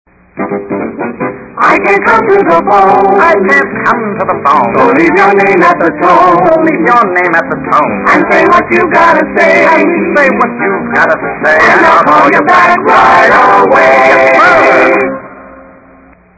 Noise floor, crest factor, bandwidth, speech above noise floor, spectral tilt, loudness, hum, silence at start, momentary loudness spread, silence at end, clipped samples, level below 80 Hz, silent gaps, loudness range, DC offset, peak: -39 dBFS; 6 dB; 8 kHz; 33 dB; -6 dB/octave; -6 LUFS; none; 0.35 s; 9 LU; 0.8 s; 4%; -42 dBFS; none; 3 LU; under 0.1%; 0 dBFS